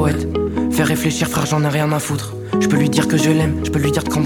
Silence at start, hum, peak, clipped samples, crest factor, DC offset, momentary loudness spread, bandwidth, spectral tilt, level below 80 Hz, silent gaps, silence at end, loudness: 0 s; none; -2 dBFS; under 0.1%; 16 dB; under 0.1%; 5 LU; 18.5 kHz; -5.5 dB/octave; -36 dBFS; none; 0 s; -17 LUFS